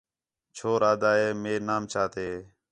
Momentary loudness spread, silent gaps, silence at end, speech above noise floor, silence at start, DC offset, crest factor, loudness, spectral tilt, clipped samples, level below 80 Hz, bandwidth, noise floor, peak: 13 LU; none; 0.25 s; 61 dB; 0.55 s; under 0.1%; 18 dB; -27 LUFS; -5 dB/octave; under 0.1%; -62 dBFS; 10.5 kHz; -87 dBFS; -10 dBFS